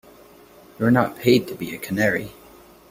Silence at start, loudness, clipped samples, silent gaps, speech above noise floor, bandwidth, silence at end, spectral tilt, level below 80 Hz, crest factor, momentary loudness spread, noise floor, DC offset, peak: 0.8 s; -21 LUFS; under 0.1%; none; 28 dB; 16.5 kHz; 0.6 s; -6 dB/octave; -56 dBFS; 20 dB; 12 LU; -48 dBFS; under 0.1%; -2 dBFS